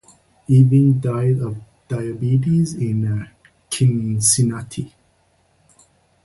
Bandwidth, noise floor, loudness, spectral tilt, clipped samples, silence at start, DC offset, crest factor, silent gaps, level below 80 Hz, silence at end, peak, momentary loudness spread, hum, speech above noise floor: 12 kHz; -60 dBFS; -18 LUFS; -6 dB/octave; under 0.1%; 0.5 s; under 0.1%; 18 dB; none; -50 dBFS; 1.35 s; -2 dBFS; 17 LU; none; 43 dB